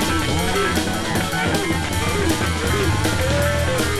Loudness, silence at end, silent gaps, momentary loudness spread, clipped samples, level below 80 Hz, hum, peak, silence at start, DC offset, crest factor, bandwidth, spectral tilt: -20 LUFS; 0 s; none; 2 LU; under 0.1%; -32 dBFS; none; -6 dBFS; 0 s; under 0.1%; 14 dB; 15.5 kHz; -4.5 dB/octave